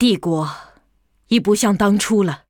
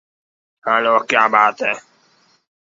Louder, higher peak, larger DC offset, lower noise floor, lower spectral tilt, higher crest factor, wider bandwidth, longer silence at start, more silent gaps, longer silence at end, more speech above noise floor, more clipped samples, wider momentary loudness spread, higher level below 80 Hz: about the same, -17 LUFS vs -15 LUFS; about the same, -2 dBFS vs 0 dBFS; neither; first, -61 dBFS vs -57 dBFS; first, -5 dB/octave vs -3 dB/octave; about the same, 16 dB vs 18 dB; first, 18.5 kHz vs 7.8 kHz; second, 0 s vs 0.65 s; neither; second, 0.15 s vs 0.8 s; about the same, 44 dB vs 42 dB; neither; second, 9 LU vs 12 LU; first, -50 dBFS vs -72 dBFS